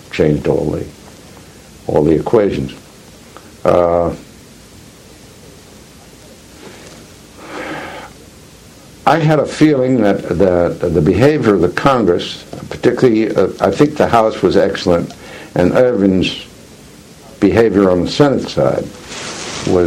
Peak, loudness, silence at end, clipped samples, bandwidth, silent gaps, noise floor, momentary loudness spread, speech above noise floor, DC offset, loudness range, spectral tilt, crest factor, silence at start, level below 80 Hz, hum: 0 dBFS; -14 LUFS; 0 s; under 0.1%; 15.5 kHz; none; -39 dBFS; 16 LU; 27 dB; under 0.1%; 12 LU; -6.5 dB/octave; 14 dB; 0.1 s; -40 dBFS; none